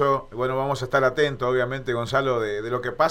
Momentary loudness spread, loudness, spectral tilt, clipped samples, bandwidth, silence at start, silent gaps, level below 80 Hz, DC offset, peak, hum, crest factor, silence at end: 5 LU; -24 LUFS; -6 dB/octave; under 0.1%; 16 kHz; 0 s; none; -48 dBFS; under 0.1%; -6 dBFS; none; 18 dB; 0 s